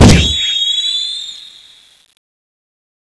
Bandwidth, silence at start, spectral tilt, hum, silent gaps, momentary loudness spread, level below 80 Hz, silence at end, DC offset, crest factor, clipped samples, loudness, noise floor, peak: 11 kHz; 0 s; -4.5 dB/octave; none; none; 20 LU; -24 dBFS; 1.55 s; under 0.1%; 14 dB; 0.7%; -12 LUFS; -43 dBFS; 0 dBFS